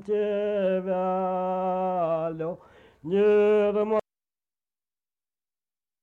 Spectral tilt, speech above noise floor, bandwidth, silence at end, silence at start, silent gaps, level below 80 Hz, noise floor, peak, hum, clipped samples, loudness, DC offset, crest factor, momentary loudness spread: -8.5 dB/octave; over 67 dB; 4.1 kHz; 2 s; 0 s; none; -66 dBFS; under -90 dBFS; -14 dBFS; 50 Hz at -55 dBFS; under 0.1%; -25 LUFS; under 0.1%; 12 dB; 11 LU